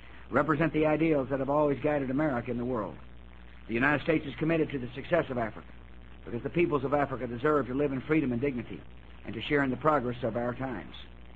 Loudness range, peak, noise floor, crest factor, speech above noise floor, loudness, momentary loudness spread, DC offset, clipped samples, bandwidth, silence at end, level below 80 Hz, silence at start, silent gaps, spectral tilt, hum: 2 LU; -10 dBFS; -50 dBFS; 20 dB; 20 dB; -29 LUFS; 14 LU; 0.3%; under 0.1%; 7.8 kHz; 0 s; -50 dBFS; 0 s; none; -9 dB/octave; none